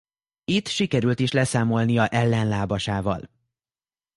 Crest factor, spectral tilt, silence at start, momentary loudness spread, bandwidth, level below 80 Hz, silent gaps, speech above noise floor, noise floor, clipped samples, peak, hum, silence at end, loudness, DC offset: 18 dB; -5.5 dB/octave; 0.5 s; 6 LU; 11.5 kHz; -50 dBFS; none; over 68 dB; under -90 dBFS; under 0.1%; -6 dBFS; none; 0.9 s; -23 LUFS; under 0.1%